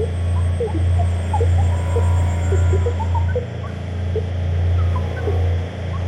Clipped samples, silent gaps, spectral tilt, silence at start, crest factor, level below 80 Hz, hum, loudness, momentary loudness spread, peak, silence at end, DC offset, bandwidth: under 0.1%; none; -7.5 dB/octave; 0 s; 10 dB; -28 dBFS; none; -20 LUFS; 6 LU; -8 dBFS; 0 s; under 0.1%; 8.8 kHz